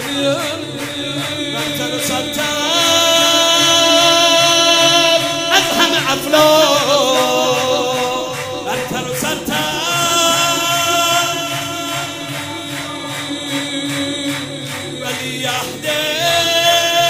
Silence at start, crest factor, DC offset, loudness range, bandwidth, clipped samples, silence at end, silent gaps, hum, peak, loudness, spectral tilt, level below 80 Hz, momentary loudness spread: 0 s; 16 dB; under 0.1%; 10 LU; 16 kHz; under 0.1%; 0 s; none; none; 0 dBFS; -14 LUFS; -2 dB/octave; -52 dBFS; 13 LU